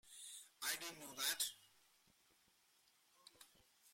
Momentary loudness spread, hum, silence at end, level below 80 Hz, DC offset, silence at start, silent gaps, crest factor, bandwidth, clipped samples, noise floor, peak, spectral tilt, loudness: 24 LU; none; 0 s; -90 dBFS; under 0.1%; 0.05 s; none; 26 dB; 16.5 kHz; under 0.1%; -76 dBFS; -26 dBFS; 1 dB/octave; -44 LUFS